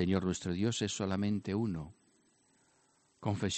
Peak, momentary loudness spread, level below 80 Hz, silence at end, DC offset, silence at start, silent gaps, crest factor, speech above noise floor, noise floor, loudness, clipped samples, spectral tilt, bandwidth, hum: -16 dBFS; 8 LU; -66 dBFS; 0 s; under 0.1%; 0 s; none; 18 dB; 37 dB; -71 dBFS; -35 LUFS; under 0.1%; -5.5 dB/octave; 8.8 kHz; none